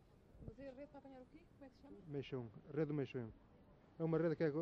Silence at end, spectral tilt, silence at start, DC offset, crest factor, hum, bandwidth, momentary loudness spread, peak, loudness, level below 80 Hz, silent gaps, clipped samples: 0 s; -7.5 dB/octave; 0.3 s; under 0.1%; 18 dB; none; 6.2 kHz; 23 LU; -26 dBFS; -44 LUFS; -70 dBFS; none; under 0.1%